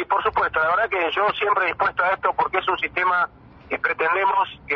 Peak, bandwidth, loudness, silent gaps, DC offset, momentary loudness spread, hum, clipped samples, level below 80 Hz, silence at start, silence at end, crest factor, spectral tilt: -6 dBFS; 6.4 kHz; -21 LUFS; none; under 0.1%; 4 LU; none; under 0.1%; -54 dBFS; 0 s; 0 s; 16 dB; -5.5 dB/octave